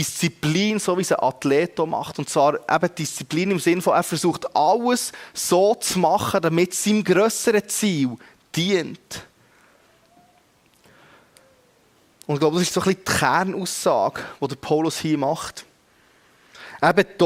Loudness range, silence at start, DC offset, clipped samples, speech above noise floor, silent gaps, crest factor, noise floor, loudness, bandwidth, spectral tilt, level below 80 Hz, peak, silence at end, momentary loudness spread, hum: 8 LU; 0 s; under 0.1%; under 0.1%; 38 dB; none; 18 dB; -58 dBFS; -21 LUFS; 16.5 kHz; -4.5 dB/octave; -60 dBFS; -4 dBFS; 0 s; 10 LU; none